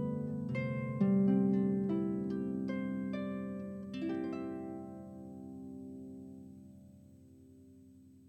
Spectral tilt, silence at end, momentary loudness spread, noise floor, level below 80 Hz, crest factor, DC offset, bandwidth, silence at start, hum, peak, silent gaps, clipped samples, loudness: -9.5 dB/octave; 0 s; 19 LU; -59 dBFS; -70 dBFS; 16 dB; under 0.1%; 5.2 kHz; 0 s; none; -20 dBFS; none; under 0.1%; -35 LUFS